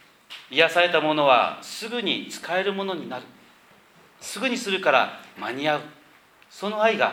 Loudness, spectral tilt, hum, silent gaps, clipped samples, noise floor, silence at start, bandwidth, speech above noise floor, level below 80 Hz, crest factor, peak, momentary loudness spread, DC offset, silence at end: -23 LUFS; -3.5 dB/octave; none; none; under 0.1%; -55 dBFS; 0.3 s; 18 kHz; 31 dB; -74 dBFS; 22 dB; -2 dBFS; 16 LU; under 0.1%; 0 s